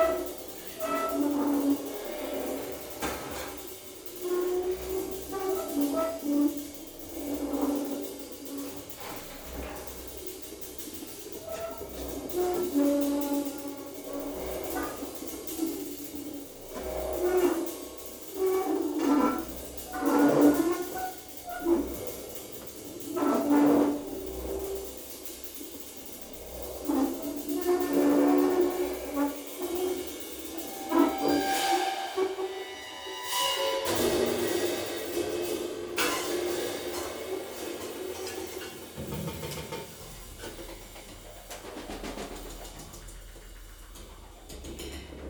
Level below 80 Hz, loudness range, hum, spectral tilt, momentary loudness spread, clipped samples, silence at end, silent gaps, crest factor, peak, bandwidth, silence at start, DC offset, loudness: -52 dBFS; 11 LU; none; -4 dB/octave; 15 LU; under 0.1%; 0 s; none; 22 dB; -10 dBFS; over 20 kHz; 0 s; under 0.1%; -31 LUFS